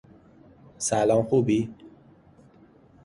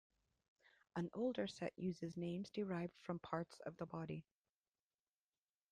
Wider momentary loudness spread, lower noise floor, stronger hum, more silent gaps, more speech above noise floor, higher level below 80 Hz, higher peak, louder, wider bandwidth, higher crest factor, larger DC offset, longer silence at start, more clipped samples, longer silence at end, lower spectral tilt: about the same, 9 LU vs 8 LU; second, -55 dBFS vs under -90 dBFS; neither; neither; second, 32 dB vs over 44 dB; first, -58 dBFS vs -80 dBFS; first, -10 dBFS vs -26 dBFS; first, -24 LUFS vs -47 LUFS; first, 11.5 kHz vs 10 kHz; about the same, 18 dB vs 22 dB; neither; second, 0.8 s vs 0.95 s; neither; second, 1.15 s vs 1.5 s; second, -5.5 dB/octave vs -7 dB/octave